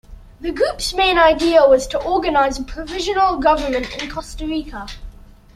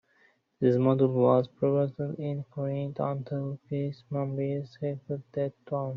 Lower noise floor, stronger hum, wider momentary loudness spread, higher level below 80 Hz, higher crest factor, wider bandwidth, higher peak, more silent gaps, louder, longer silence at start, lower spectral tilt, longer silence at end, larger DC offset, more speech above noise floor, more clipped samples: second, -39 dBFS vs -66 dBFS; neither; first, 15 LU vs 11 LU; first, -36 dBFS vs -70 dBFS; about the same, 16 dB vs 20 dB; first, 15 kHz vs 5.4 kHz; first, -2 dBFS vs -10 dBFS; neither; first, -17 LUFS vs -29 LUFS; second, 0.1 s vs 0.6 s; second, -3.5 dB/octave vs -9.5 dB/octave; first, 0.35 s vs 0 s; neither; second, 22 dB vs 38 dB; neither